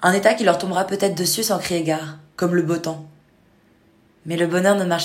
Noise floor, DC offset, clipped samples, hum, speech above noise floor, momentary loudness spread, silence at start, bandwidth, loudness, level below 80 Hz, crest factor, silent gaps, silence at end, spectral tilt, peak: -56 dBFS; under 0.1%; under 0.1%; none; 37 dB; 12 LU; 0 s; 16.5 kHz; -20 LUFS; -62 dBFS; 20 dB; none; 0 s; -4 dB/octave; 0 dBFS